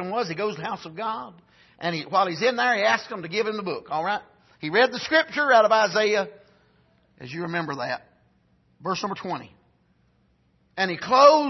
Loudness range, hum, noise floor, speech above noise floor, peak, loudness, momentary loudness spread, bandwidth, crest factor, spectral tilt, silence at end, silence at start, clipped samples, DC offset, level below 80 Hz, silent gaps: 10 LU; none; -64 dBFS; 41 dB; -4 dBFS; -24 LUFS; 16 LU; 6.2 kHz; 22 dB; -4 dB/octave; 0 s; 0 s; under 0.1%; under 0.1%; -70 dBFS; none